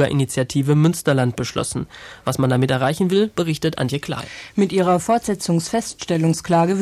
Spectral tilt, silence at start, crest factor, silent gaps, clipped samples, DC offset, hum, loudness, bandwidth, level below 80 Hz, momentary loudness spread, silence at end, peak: -6 dB/octave; 0 s; 14 dB; none; under 0.1%; under 0.1%; none; -20 LUFS; 14.5 kHz; -50 dBFS; 9 LU; 0 s; -6 dBFS